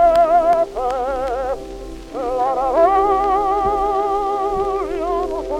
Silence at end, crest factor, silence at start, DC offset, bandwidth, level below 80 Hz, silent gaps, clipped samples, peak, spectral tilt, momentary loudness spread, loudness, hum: 0 s; 14 dB; 0 s; under 0.1%; 12.5 kHz; -36 dBFS; none; under 0.1%; -2 dBFS; -6 dB/octave; 11 LU; -18 LUFS; none